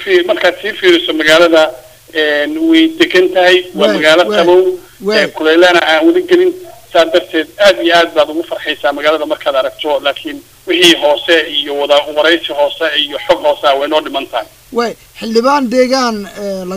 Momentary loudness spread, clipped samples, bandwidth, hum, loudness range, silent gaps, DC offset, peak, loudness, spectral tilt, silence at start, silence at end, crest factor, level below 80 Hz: 11 LU; 0.4%; 16 kHz; none; 4 LU; none; 0.3%; 0 dBFS; -11 LUFS; -3 dB/octave; 0 s; 0 s; 12 dB; -50 dBFS